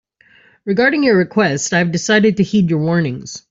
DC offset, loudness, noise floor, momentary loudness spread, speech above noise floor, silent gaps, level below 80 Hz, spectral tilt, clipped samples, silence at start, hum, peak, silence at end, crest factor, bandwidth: under 0.1%; -15 LUFS; -51 dBFS; 8 LU; 36 dB; none; -54 dBFS; -5 dB/octave; under 0.1%; 0.65 s; none; -2 dBFS; 0.1 s; 12 dB; 8 kHz